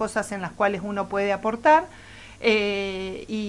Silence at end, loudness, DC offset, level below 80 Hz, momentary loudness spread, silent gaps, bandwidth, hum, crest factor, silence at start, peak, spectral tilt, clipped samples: 0 s; -24 LUFS; under 0.1%; -52 dBFS; 13 LU; none; 11.5 kHz; none; 18 dB; 0 s; -6 dBFS; -4.5 dB/octave; under 0.1%